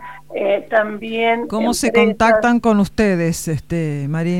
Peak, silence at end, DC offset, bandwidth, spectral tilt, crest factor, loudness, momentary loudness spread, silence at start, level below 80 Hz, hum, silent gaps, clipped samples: 0 dBFS; 0 s; 0.8%; 16 kHz; -5.5 dB/octave; 16 dB; -17 LUFS; 9 LU; 0 s; -42 dBFS; none; none; under 0.1%